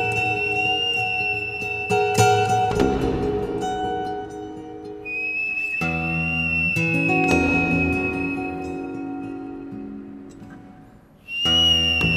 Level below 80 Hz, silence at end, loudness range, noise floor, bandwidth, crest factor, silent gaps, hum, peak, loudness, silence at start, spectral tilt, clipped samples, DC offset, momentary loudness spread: -42 dBFS; 0 s; 6 LU; -48 dBFS; 15.5 kHz; 20 dB; none; none; -4 dBFS; -21 LUFS; 0 s; -4 dB/octave; under 0.1%; under 0.1%; 17 LU